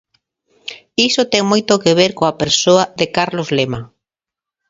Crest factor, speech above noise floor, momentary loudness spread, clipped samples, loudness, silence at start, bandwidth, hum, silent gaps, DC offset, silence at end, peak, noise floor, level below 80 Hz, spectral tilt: 16 dB; 72 dB; 14 LU; under 0.1%; -14 LUFS; 0.65 s; 7.8 kHz; none; none; under 0.1%; 0.85 s; 0 dBFS; -87 dBFS; -52 dBFS; -3.5 dB/octave